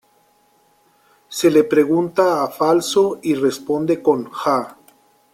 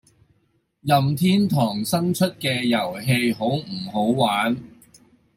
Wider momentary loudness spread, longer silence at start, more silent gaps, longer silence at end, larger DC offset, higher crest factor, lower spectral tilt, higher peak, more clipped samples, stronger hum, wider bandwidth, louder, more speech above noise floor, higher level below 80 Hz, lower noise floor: about the same, 6 LU vs 6 LU; first, 1.3 s vs 0.85 s; neither; about the same, 0.6 s vs 0.7 s; neither; about the same, 16 dB vs 18 dB; about the same, -5 dB/octave vs -5.5 dB/octave; about the same, -2 dBFS vs -4 dBFS; neither; neither; about the same, 16 kHz vs 16.5 kHz; first, -18 LUFS vs -21 LUFS; second, 41 dB vs 46 dB; about the same, -62 dBFS vs -60 dBFS; second, -58 dBFS vs -67 dBFS